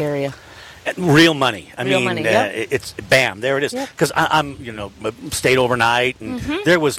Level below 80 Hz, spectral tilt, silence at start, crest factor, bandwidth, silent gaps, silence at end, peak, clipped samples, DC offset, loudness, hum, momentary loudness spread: -48 dBFS; -4.5 dB/octave; 0 s; 14 dB; 16.5 kHz; none; 0 s; -4 dBFS; under 0.1%; under 0.1%; -18 LUFS; none; 13 LU